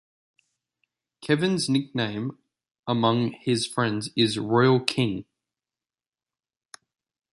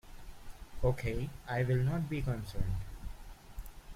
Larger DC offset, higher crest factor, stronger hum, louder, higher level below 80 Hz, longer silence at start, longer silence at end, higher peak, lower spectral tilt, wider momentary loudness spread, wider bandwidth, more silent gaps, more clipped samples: neither; first, 26 dB vs 18 dB; neither; first, -24 LUFS vs -35 LUFS; second, -64 dBFS vs -44 dBFS; first, 1.2 s vs 0.05 s; first, 2.1 s vs 0 s; first, -2 dBFS vs -18 dBFS; second, -5.5 dB/octave vs -7.5 dB/octave; second, 12 LU vs 22 LU; second, 11.5 kHz vs 16 kHz; first, 2.71-2.83 s vs none; neither